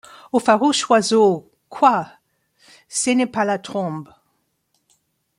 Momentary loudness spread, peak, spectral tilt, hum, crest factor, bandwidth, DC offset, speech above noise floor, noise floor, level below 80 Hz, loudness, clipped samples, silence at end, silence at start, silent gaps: 12 LU; -2 dBFS; -3.5 dB/octave; none; 18 dB; 15 kHz; under 0.1%; 51 dB; -69 dBFS; -68 dBFS; -19 LUFS; under 0.1%; 1.35 s; 0.35 s; none